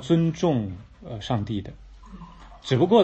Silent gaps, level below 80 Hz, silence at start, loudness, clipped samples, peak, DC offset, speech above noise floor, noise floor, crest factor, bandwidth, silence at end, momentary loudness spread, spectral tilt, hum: none; -48 dBFS; 0 s; -25 LUFS; under 0.1%; -6 dBFS; under 0.1%; 21 dB; -43 dBFS; 20 dB; 8.4 kHz; 0 s; 23 LU; -7.5 dB/octave; none